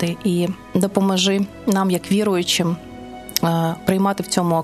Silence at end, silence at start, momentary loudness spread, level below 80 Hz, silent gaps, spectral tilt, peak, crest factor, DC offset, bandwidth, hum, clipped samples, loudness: 0 s; 0 s; 6 LU; -52 dBFS; none; -5 dB/octave; 0 dBFS; 20 dB; under 0.1%; 14.5 kHz; none; under 0.1%; -20 LUFS